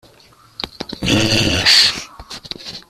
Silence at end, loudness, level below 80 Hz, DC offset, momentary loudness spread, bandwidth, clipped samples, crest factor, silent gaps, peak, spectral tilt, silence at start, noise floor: 0.1 s; -12 LUFS; -40 dBFS; under 0.1%; 20 LU; 15 kHz; under 0.1%; 18 dB; none; 0 dBFS; -2.5 dB/octave; 0.6 s; -48 dBFS